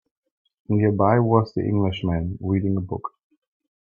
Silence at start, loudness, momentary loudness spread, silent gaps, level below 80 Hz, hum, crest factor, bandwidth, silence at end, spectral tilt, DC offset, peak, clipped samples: 0.7 s; -22 LUFS; 10 LU; none; -50 dBFS; none; 20 dB; 5.2 kHz; 0.75 s; -10 dB/octave; under 0.1%; -2 dBFS; under 0.1%